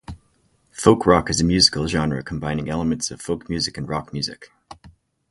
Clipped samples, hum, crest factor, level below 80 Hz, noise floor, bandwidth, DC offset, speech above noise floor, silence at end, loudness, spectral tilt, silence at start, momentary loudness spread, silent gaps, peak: under 0.1%; none; 22 dB; -40 dBFS; -62 dBFS; 11.5 kHz; under 0.1%; 42 dB; 0.4 s; -20 LUFS; -4.5 dB/octave; 0.1 s; 13 LU; none; 0 dBFS